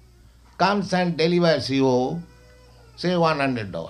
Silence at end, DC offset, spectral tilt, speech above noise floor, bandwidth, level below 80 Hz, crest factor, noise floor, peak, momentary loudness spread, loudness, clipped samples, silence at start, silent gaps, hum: 0 s; under 0.1%; -6 dB/octave; 30 dB; 11 kHz; -52 dBFS; 18 dB; -51 dBFS; -4 dBFS; 7 LU; -22 LUFS; under 0.1%; 0.6 s; none; none